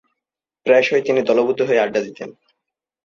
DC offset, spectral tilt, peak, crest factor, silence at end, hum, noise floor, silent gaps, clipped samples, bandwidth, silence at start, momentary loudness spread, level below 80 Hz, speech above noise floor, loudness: under 0.1%; -5 dB/octave; -2 dBFS; 16 dB; 0.75 s; none; -85 dBFS; none; under 0.1%; 7.2 kHz; 0.65 s; 16 LU; -66 dBFS; 68 dB; -17 LUFS